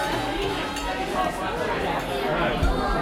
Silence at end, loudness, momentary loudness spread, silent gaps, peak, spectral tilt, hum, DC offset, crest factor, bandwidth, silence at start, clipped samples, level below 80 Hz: 0 s; -26 LUFS; 4 LU; none; -10 dBFS; -5 dB/octave; none; under 0.1%; 14 dB; 16.5 kHz; 0 s; under 0.1%; -34 dBFS